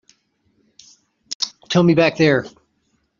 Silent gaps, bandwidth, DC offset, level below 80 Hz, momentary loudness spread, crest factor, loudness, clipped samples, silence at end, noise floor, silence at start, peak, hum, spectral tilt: 1.35-1.40 s; 7.4 kHz; under 0.1%; -58 dBFS; 15 LU; 18 dB; -17 LUFS; under 0.1%; 0.7 s; -67 dBFS; 1.3 s; -2 dBFS; none; -5 dB/octave